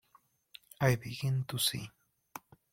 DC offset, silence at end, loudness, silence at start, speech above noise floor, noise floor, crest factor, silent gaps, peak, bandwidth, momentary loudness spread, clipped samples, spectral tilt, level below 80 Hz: under 0.1%; 0.35 s; -33 LUFS; 0.8 s; 36 dB; -68 dBFS; 22 dB; none; -14 dBFS; 16.5 kHz; 20 LU; under 0.1%; -4.5 dB/octave; -64 dBFS